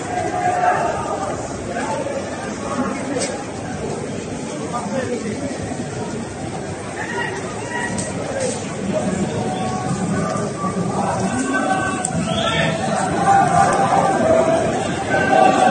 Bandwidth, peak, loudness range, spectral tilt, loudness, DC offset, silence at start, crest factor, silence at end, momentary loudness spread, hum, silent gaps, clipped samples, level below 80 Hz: 9.6 kHz; 0 dBFS; 8 LU; -4.5 dB/octave; -20 LUFS; under 0.1%; 0 s; 20 dB; 0 s; 11 LU; none; none; under 0.1%; -46 dBFS